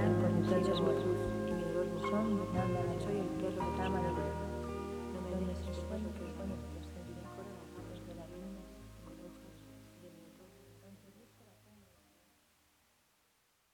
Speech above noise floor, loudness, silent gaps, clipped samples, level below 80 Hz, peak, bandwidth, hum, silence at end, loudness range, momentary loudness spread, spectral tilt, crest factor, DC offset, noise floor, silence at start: 37 dB; -37 LUFS; none; under 0.1%; -52 dBFS; -20 dBFS; 19 kHz; none; 2.5 s; 22 LU; 24 LU; -7 dB/octave; 20 dB; under 0.1%; -75 dBFS; 0 s